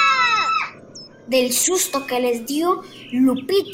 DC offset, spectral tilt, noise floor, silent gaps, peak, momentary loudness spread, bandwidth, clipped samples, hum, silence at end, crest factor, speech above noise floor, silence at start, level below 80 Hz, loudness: under 0.1%; -1.5 dB/octave; -41 dBFS; none; -6 dBFS; 12 LU; 16 kHz; under 0.1%; none; 0 s; 14 dB; 21 dB; 0 s; -64 dBFS; -19 LUFS